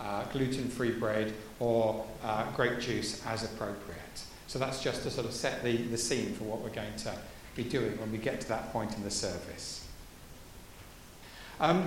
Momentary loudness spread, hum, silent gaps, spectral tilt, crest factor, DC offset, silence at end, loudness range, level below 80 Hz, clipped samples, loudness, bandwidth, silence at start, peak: 18 LU; none; none; -4.5 dB/octave; 22 dB; under 0.1%; 0 s; 5 LU; -54 dBFS; under 0.1%; -34 LUFS; 16.5 kHz; 0 s; -12 dBFS